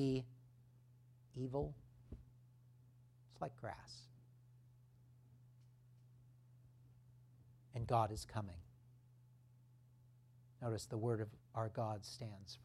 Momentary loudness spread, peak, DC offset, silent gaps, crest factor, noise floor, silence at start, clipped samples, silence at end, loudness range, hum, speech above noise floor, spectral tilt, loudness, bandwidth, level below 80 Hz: 26 LU; -22 dBFS; under 0.1%; none; 26 dB; -67 dBFS; 0 s; under 0.1%; 0 s; 16 LU; none; 24 dB; -6.5 dB/octave; -45 LUFS; 13 kHz; -68 dBFS